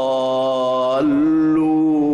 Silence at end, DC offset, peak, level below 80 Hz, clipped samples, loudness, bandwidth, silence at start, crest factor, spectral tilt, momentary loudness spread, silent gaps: 0 s; under 0.1%; -10 dBFS; -54 dBFS; under 0.1%; -17 LUFS; 9 kHz; 0 s; 6 dB; -7 dB/octave; 3 LU; none